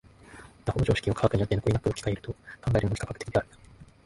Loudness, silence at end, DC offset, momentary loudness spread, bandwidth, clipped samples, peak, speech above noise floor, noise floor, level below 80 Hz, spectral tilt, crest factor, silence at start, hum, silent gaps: -28 LUFS; 0.2 s; under 0.1%; 13 LU; 11.5 kHz; under 0.1%; -6 dBFS; 22 dB; -50 dBFS; -44 dBFS; -6.5 dB/octave; 22 dB; 0.3 s; none; none